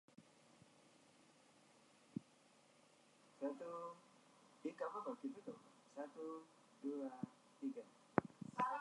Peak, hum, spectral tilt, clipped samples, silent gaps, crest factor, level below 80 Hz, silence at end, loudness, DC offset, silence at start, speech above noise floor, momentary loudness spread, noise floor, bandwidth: -16 dBFS; none; -6.5 dB/octave; under 0.1%; none; 34 dB; -84 dBFS; 0 s; -49 LUFS; under 0.1%; 0.2 s; 22 dB; 26 LU; -72 dBFS; 11 kHz